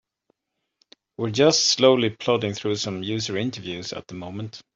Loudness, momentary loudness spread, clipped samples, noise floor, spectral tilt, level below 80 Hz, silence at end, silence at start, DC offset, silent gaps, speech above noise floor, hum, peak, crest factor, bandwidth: -22 LUFS; 17 LU; under 0.1%; -80 dBFS; -4 dB/octave; -64 dBFS; 0.15 s; 1.2 s; under 0.1%; none; 57 dB; none; -4 dBFS; 20 dB; 7.8 kHz